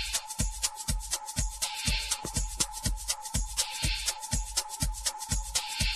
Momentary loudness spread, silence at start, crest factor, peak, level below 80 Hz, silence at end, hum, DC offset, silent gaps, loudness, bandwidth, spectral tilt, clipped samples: 4 LU; 0 s; 20 dB; -12 dBFS; -38 dBFS; 0 s; none; under 0.1%; none; -31 LUFS; 13.5 kHz; -1.5 dB/octave; under 0.1%